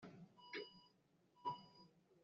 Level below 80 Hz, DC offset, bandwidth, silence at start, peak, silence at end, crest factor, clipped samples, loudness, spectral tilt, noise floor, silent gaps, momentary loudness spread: under -90 dBFS; under 0.1%; 7.2 kHz; 0 s; -34 dBFS; 0 s; 22 dB; under 0.1%; -53 LUFS; -2.5 dB/octave; -77 dBFS; none; 17 LU